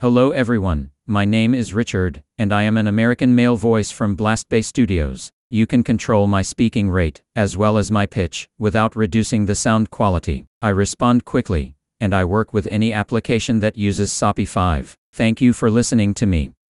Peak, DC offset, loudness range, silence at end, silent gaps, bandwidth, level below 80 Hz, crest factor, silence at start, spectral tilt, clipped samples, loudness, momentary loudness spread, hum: -2 dBFS; under 0.1%; 2 LU; 0.2 s; 5.33-5.50 s, 10.47-10.61 s, 14.98-15.13 s; 11.5 kHz; -36 dBFS; 14 dB; 0 s; -6 dB/octave; under 0.1%; -18 LUFS; 7 LU; none